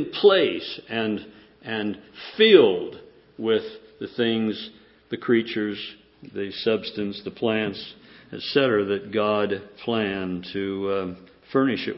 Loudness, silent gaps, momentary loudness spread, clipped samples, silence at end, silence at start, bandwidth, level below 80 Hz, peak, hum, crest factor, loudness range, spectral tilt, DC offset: -24 LUFS; none; 19 LU; under 0.1%; 0 s; 0 s; 5.8 kHz; -62 dBFS; -2 dBFS; none; 22 dB; 5 LU; -9.5 dB/octave; under 0.1%